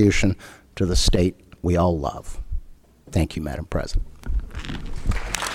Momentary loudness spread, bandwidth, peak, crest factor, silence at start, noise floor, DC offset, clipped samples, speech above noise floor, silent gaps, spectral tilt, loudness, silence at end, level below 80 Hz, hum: 15 LU; 19 kHz; -4 dBFS; 18 dB; 0 s; -45 dBFS; under 0.1%; under 0.1%; 23 dB; none; -5 dB/octave; -25 LUFS; 0 s; -28 dBFS; none